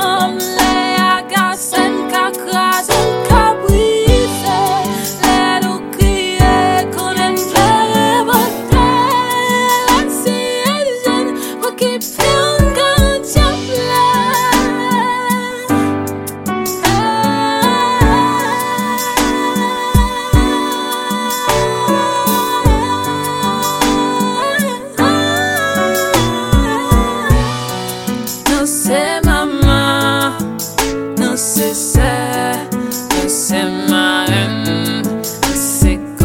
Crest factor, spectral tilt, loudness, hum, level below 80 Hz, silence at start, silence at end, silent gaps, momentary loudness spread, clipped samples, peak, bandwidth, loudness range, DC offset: 14 dB; -4 dB/octave; -14 LUFS; none; -24 dBFS; 0 s; 0 s; none; 6 LU; under 0.1%; 0 dBFS; 17 kHz; 2 LU; under 0.1%